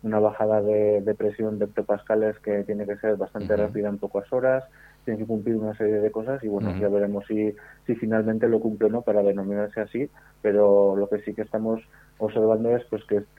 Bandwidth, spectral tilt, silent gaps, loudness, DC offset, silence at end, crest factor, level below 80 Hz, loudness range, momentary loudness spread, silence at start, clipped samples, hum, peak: 4.8 kHz; -9.5 dB/octave; none; -25 LUFS; under 0.1%; 0.15 s; 16 dB; -58 dBFS; 3 LU; 8 LU; 0.05 s; under 0.1%; none; -8 dBFS